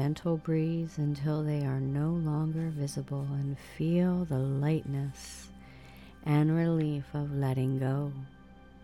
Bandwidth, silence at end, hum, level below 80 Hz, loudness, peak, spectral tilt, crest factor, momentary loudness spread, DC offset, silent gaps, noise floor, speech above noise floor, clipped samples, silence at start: 12.5 kHz; 0 s; none; -56 dBFS; -31 LUFS; -16 dBFS; -8 dB/octave; 16 dB; 16 LU; under 0.1%; none; -53 dBFS; 23 dB; under 0.1%; 0 s